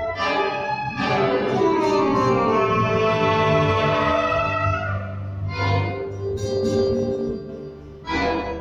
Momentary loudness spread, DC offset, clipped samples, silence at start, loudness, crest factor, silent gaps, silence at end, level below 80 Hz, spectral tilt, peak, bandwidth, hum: 10 LU; under 0.1%; under 0.1%; 0 s; -21 LUFS; 14 dB; none; 0 s; -44 dBFS; -6.5 dB/octave; -6 dBFS; 9.6 kHz; none